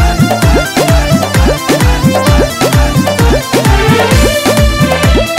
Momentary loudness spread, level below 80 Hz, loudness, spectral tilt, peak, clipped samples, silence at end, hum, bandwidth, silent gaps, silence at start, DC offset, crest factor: 2 LU; -14 dBFS; -9 LUFS; -5 dB/octave; 0 dBFS; under 0.1%; 0 s; none; 16.5 kHz; none; 0 s; 0.3%; 8 dB